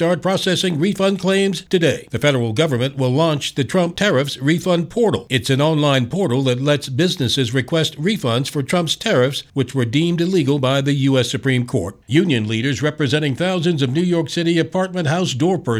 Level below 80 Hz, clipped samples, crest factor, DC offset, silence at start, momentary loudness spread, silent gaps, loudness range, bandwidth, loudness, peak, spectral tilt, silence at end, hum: -52 dBFS; under 0.1%; 16 dB; under 0.1%; 0 s; 3 LU; none; 1 LU; 15.5 kHz; -18 LUFS; -2 dBFS; -5.5 dB/octave; 0 s; none